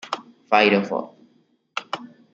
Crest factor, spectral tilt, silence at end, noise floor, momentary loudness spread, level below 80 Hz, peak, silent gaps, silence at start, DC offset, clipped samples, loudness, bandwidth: 22 dB; -5 dB/octave; 0.3 s; -62 dBFS; 17 LU; -70 dBFS; -2 dBFS; none; 0.05 s; under 0.1%; under 0.1%; -21 LUFS; 7.8 kHz